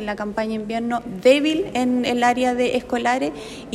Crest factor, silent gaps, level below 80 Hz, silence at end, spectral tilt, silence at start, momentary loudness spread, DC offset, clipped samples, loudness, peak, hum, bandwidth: 16 dB; none; -50 dBFS; 0 s; -4.5 dB/octave; 0 s; 9 LU; under 0.1%; under 0.1%; -21 LUFS; -4 dBFS; none; 13.5 kHz